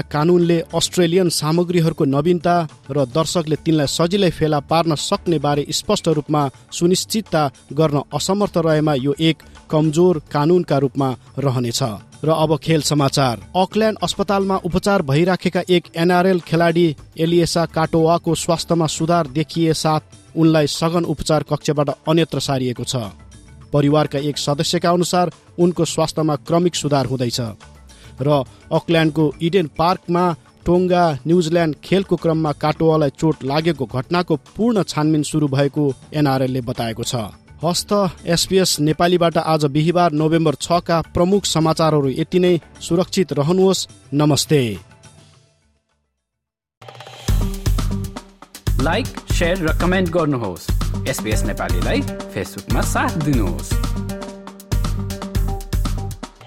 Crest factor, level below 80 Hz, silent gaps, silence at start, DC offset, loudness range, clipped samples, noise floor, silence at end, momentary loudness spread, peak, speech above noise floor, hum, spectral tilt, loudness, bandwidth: 14 dB; -32 dBFS; 46.77-46.81 s; 0.05 s; under 0.1%; 5 LU; under 0.1%; -81 dBFS; 0 s; 8 LU; -4 dBFS; 64 dB; none; -5.5 dB/octave; -18 LUFS; 16 kHz